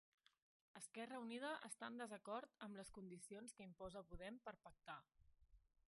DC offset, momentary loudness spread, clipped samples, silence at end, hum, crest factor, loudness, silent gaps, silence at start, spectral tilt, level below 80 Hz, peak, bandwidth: under 0.1%; 9 LU; under 0.1%; 0.4 s; none; 20 dB; -55 LUFS; none; 0.75 s; -3.5 dB/octave; -76 dBFS; -36 dBFS; 11.5 kHz